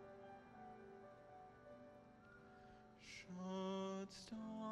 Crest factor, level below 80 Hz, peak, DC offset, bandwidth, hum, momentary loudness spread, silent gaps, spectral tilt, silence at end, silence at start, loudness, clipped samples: 18 dB; -80 dBFS; -34 dBFS; under 0.1%; 11.5 kHz; none; 17 LU; none; -5.5 dB/octave; 0 s; 0 s; -53 LUFS; under 0.1%